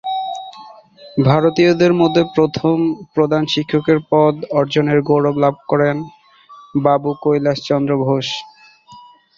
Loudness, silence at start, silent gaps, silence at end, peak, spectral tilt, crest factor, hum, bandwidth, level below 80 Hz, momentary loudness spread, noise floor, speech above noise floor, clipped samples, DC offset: -16 LUFS; 0.05 s; none; 0.4 s; 0 dBFS; -7 dB/octave; 16 dB; none; 7.4 kHz; -54 dBFS; 11 LU; -43 dBFS; 28 dB; under 0.1%; under 0.1%